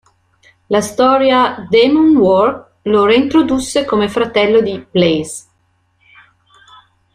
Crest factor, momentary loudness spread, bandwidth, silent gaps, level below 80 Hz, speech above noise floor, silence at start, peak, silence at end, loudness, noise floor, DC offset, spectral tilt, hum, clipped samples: 14 dB; 8 LU; 13 kHz; none; -48 dBFS; 48 dB; 0.7 s; 0 dBFS; 1.75 s; -13 LUFS; -60 dBFS; under 0.1%; -5 dB/octave; none; under 0.1%